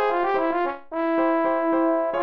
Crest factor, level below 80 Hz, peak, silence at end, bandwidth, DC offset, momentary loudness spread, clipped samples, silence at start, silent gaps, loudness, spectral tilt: 12 dB; -60 dBFS; -12 dBFS; 0 s; 5.4 kHz; under 0.1%; 5 LU; under 0.1%; 0 s; none; -23 LUFS; -7 dB/octave